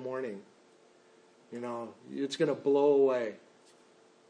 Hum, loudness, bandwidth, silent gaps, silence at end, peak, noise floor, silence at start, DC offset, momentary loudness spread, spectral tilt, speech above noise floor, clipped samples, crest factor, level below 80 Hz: none; -31 LUFS; 10 kHz; none; 0.95 s; -16 dBFS; -62 dBFS; 0 s; under 0.1%; 17 LU; -5.5 dB/octave; 32 dB; under 0.1%; 16 dB; under -90 dBFS